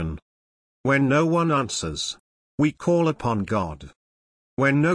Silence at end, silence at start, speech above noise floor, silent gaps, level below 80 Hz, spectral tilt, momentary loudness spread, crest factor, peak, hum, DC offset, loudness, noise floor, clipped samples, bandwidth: 0 s; 0 s; over 68 dB; 0.22-0.84 s, 2.20-2.58 s, 3.96-4.57 s; -48 dBFS; -5.5 dB/octave; 18 LU; 14 dB; -10 dBFS; none; under 0.1%; -23 LUFS; under -90 dBFS; under 0.1%; 10.5 kHz